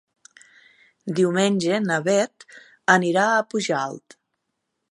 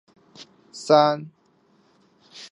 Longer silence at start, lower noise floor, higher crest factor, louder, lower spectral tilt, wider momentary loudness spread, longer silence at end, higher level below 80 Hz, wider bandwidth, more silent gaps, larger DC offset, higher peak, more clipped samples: first, 1.05 s vs 0.75 s; first, -78 dBFS vs -62 dBFS; about the same, 22 dB vs 24 dB; about the same, -21 LUFS vs -20 LUFS; about the same, -4.5 dB/octave vs -5 dB/octave; second, 11 LU vs 25 LU; first, 0.95 s vs 0.05 s; first, -72 dBFS vs -80 dBFS; about the same, 11.5 kHz vs 11.5 kHz; neither; neither; about the same, -2 dBFS vs -2 dBFS; neither